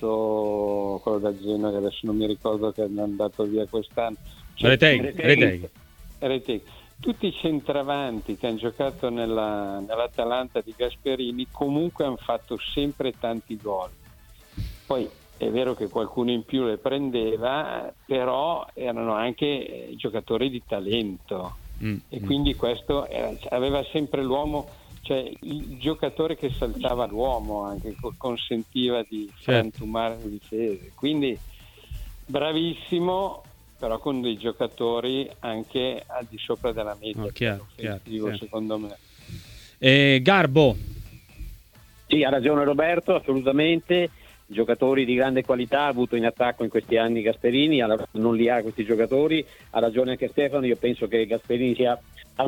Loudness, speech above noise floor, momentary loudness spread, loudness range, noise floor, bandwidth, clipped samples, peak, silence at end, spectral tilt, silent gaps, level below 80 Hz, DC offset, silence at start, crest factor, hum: -25 LUFS; 27 dB; 13 LU; 7 LU; -52 dBFS; 19 kHz; under 0.1%; -2 dBFS; 0 s; -6.5 dB/octave; none; -46 dBFS; under 0.1%; 0 s; 24 dB; none